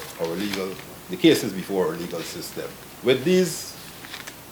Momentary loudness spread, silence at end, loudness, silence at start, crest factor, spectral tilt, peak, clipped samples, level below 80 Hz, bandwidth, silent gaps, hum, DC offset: 17 LU; 0 s; -24 LUFS; 0 s; 22 dB; -4.5 dB/octave; -4 dBFS; under 0.1%; -58 dBFS; over 20 kHz; none; none; under 0.1%